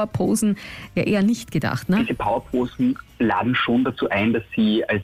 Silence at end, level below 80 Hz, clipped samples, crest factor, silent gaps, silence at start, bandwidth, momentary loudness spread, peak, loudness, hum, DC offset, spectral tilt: 0 s; -48 dBFS; under 0.1%; 10 dB; none; 0 s; 15 kHz; 5 LU; -10 dBFS; -22 LUFS; none; under 0.1%; -5.5 dB/octave